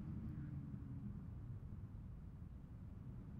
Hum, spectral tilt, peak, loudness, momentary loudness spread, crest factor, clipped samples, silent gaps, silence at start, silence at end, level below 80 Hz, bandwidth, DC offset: none; -10.5 dB/octave; -38 dBFS; -52 LUFS; 7 LU; 14 dB; under 0.1%; none; 0 s; 0 s; -58 dBFS; 5.4 kHz; under 0.1%